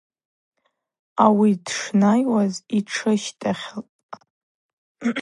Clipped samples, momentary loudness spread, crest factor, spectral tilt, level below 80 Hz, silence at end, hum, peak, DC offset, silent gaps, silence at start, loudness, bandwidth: under 0.1%; 15 LU; 20 dB; -5.5 dB/octave; -70 dBFS; 0 s; none; -2 dBFS; under 0.1%; 3.89-4.09 s, 4.30-4.95 s; 1.15 s; -21 LUFS; 11.5 kHz